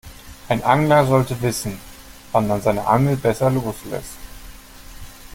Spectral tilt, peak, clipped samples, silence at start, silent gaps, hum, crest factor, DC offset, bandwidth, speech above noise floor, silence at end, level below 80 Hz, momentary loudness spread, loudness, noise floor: -6 dB/octave; -2 dBFS; under 0.1%; 0.05 s; none; none; 18 dB; under 0.1%; 17 kHz; 21 dB; 0 s; -42 dBFS; 25 LU; -19 LUFS; -39 dBFS